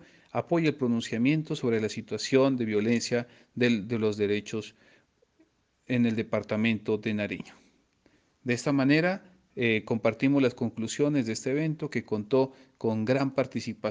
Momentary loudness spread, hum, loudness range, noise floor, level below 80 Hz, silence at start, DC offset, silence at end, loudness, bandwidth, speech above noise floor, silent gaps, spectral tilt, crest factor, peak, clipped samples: 9 LU; none; 4 LU; -67 dBFS; -70 dBFS; 0.35 s; under 0.1%; 0 s; -28 LUFS; 9.8 kHz; 40 dB; none; -6 dB/octave; 18 dB; -10 dBFS; under 0.1%